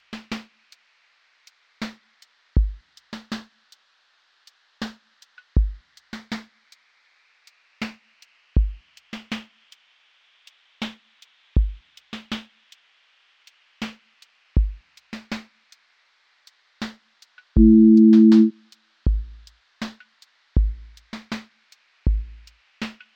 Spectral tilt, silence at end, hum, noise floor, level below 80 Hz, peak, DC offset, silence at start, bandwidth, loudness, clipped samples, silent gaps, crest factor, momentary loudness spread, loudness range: -8 dB/octave; 0.25 s; none; -64 dBFS; -30 dBFS; -4 dBFS; under 0.1%; 0.1 s; 7.6 kHz; -21 LUFS; under 0.1%; none; 20 dB; 27 LU; 16 LU